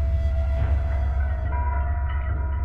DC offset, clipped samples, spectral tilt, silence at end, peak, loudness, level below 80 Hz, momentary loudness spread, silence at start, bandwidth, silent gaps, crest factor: under 0.1%; under 0.1%; -9 dB/octave; 0 s; -12 dBFS; -26 LUFS; -24 dBFS; 3 LU; 0 s; 3.5 kHz; none; 10 dB